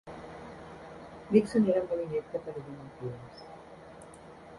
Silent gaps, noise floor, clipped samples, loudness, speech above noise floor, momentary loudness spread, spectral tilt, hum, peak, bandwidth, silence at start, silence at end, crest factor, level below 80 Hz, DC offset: none; -50 dBFS; under 0.1%; -30 LUFS; 20 dB; 23 LU; -7.5 dB/octave; none; -10 dBFS; 11.5 kHz; 0.05 s; 0 s; 24 dB; -62 dBFS; under 0.1%